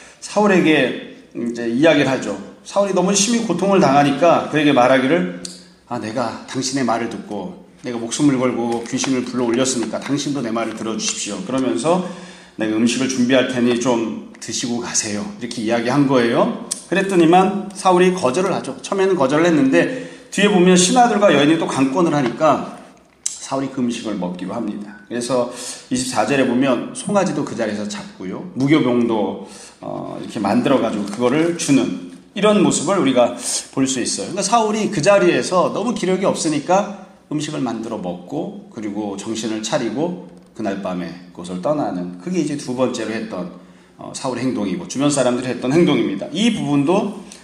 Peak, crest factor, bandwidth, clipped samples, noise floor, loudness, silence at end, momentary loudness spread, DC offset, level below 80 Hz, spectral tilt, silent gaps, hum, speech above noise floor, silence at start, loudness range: 0 dBFS; 18 dB; 13.5 kHz; under 0.1%; -43 dBFS; -18 LUFS; 0.05 s; 14 LU; under 0.1%; -60 dBFS; -4.5 dB/octave; none; none; 25 dB; 0 s; 8 LU